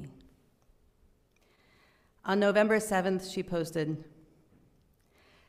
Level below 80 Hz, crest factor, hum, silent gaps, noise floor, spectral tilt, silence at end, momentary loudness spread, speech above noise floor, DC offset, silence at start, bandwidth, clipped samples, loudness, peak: -64 dBFS; 20 dB; none; none; -67 dBFS; -5.5 dB/octave; 1.45 s; 16 LU; 39 dB; under 0.1%; 0 s; 15.5 kHz; under 0.1%; -30 LUFS; -12 dBFS